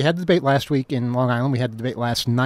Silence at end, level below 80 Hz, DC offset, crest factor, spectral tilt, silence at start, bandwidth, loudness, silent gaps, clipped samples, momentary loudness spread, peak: 0 s; -54 dBFS; under 0.1%; 16 dB; -6.5 dB/octave; 0 s; 15.5 kHz; -21 LUFS; none; under 0.1%; 5 LU; -6 dBFS